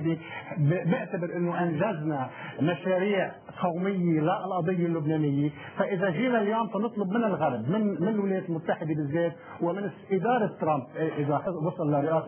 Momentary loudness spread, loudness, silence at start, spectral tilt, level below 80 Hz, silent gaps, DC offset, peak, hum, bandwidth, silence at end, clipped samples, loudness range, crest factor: 6 LU; -28 LUFS; 0 s; -7 dB/octave; -68 dBFS; none; under 0.1%; -12 dBFS; none; 3.4 kHz; 0 s; under 0.1%; 2 LU; 16 dB